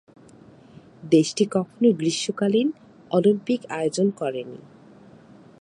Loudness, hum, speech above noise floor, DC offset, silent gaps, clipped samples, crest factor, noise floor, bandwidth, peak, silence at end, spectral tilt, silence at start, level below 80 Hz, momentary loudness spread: -23 LUFS; none; 27 dB; under 0.1%; none; under 0.1%; 18 dB; -49 dBFS; 11.5 kHz; -6 dBFS; 1.05 s; -5.5 dB/octave; 1.05 s; -70 dBFS; 15 LU